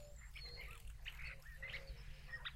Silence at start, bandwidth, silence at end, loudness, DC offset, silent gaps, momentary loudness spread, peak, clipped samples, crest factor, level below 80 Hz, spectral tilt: 0 s; 16 kHz; 0 s; -52 LUFS; under 0.1%; none; 6 LU; -36 dBFS; under 0.1%; 16 dB; -54 dBFS; -3 dB/octave